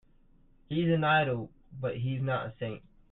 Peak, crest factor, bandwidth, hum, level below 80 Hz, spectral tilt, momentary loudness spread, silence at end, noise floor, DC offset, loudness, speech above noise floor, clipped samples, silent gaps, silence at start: -14 dBFS; 18 dB; 4.1 kHz; none; -60 dBFS; -10.5 dB/octave; 14 LU; 0.35 s; -61 dBFS; under 0.1%; -31 LUFS; 31 dB; under 0.1%; none; 0.7 s